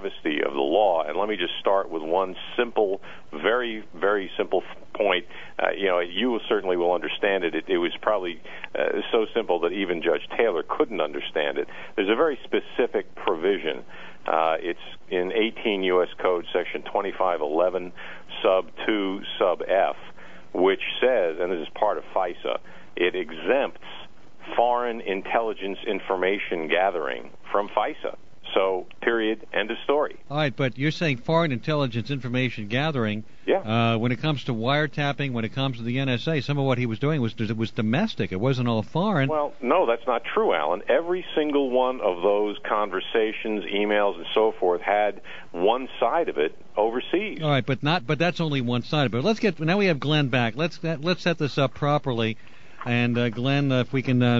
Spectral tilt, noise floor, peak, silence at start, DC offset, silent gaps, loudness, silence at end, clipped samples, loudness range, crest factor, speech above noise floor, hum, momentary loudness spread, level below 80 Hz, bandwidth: -7 dB/octave; -47 dBFS; -4 dBFS; 0 s; 1%; none; -25 LUFS; 0 s; under 0.1%; 2 LU; 20 dB; 23 dB; none; 6 LU; -62 dBFS; 7.6 kHz